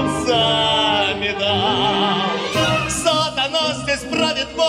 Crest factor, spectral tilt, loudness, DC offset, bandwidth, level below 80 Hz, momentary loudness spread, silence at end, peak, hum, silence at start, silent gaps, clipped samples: 14 dB; -3.5 dB/octave; -17 LUFS; under 0.1%; 16.5 kHz; -44 dBFS; 4 LU; 0 s; -4 dBFS; none; 0 s; none; under 0.1%